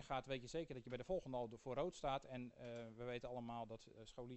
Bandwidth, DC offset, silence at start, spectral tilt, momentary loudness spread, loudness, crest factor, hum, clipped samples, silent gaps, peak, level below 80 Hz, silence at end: 8.2 kHz; under 0.1%; 0 s; -5.5 dB/octave; 8 LU; -49 LUFS; 18 dB; none; under 0.1%; none; -30 dBFS; -66 dBFS; 0 s